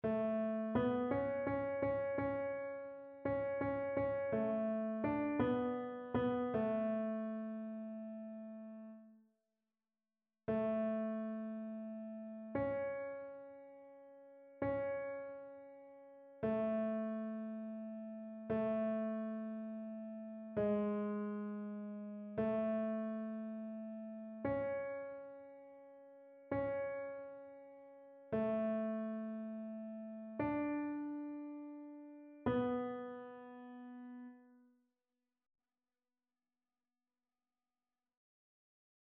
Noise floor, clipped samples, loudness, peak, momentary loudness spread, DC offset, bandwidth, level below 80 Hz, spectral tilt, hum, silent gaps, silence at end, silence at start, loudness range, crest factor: under -90 dBFS; under 0.1%; -41 LUFS; -24 dBFS; 18 LU; under 0.1%; 3.9 kHz; -70 dBFS; -7 dB/octave; none; none; 4.5 s; 0.05 s; 8 LU; 18 dB